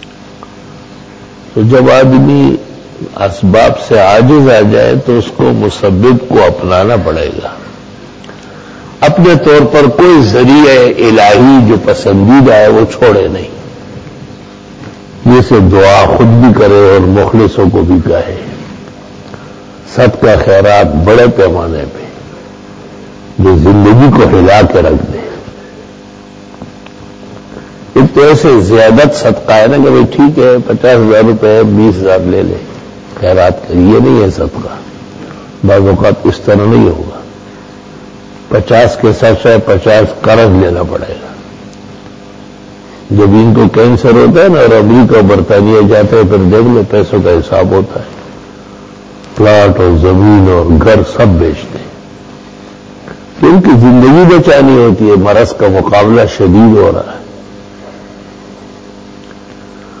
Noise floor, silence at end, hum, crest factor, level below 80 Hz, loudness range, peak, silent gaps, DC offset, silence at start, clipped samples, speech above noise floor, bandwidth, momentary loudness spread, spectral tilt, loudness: -30 dBFS; 0 s; none; 6 dB; -26 dBFS; 6 LU; 0 dBFS; none; under 0.1%; 0.65 s; 4%; 25 dB; 8 kHz; 18 LU; -7.5 dB/octave; -6 LUFS